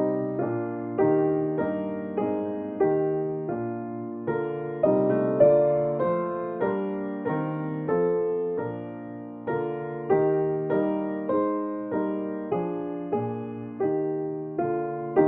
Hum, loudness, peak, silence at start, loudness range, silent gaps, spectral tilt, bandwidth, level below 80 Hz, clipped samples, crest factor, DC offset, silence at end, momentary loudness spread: none; -27 LUFS; -6 dBFS; 0 s; 5 LU; none; -9 dB/octave; 3.8 kHz; -66 dBFS; under 0.1%; 20 dB; under 0.1%; 0 s; 9 LU